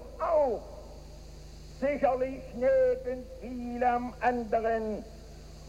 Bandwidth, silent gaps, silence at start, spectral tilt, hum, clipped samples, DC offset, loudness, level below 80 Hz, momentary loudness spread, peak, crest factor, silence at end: 10.5 kHz; none; 0 s; -6.5 dB/octave; none; under 0.1%; under 0.1%; -30 LUFS; -48 dBFS; 22 LU; -14 dBFS; 16 dB; 0 s